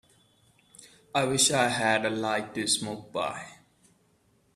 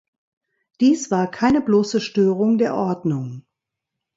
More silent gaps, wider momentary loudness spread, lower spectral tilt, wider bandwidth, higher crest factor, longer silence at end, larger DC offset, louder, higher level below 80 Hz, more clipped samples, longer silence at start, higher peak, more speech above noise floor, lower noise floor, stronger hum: neither; first, 12 LU vs 8 LU; second, -2.5 dB/octave vs -6 dB/octave; first, 14.5 kHz vs 7.8 kHz; first, 22 dB vs 16 dB; first, 1 s vs 0.75 s; neither; second, -26 LUFS vs -19 LUFS; second, -66 dBFS vs -54 dBFS; neither; about the same, 0.8 s vs 0.8 s; about the same, -8 dBFS vs -6 dBFS; second, 39 dB vs 64 dB; second, -67 dBFS vs -83 dBFS; neither